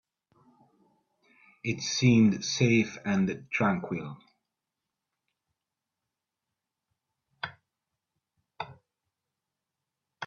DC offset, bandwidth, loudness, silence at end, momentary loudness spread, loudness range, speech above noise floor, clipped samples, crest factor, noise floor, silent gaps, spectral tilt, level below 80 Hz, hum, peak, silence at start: under 0.1%; 7.4 kHz; -27 LUFS; 0 s; 20 LU; 22 LU; 61 dB; under 0.1%; 22 dB; -88 dBFS; none; -5 dB/octave; -68 dBFS; none; -10 dBFS; 1.65 s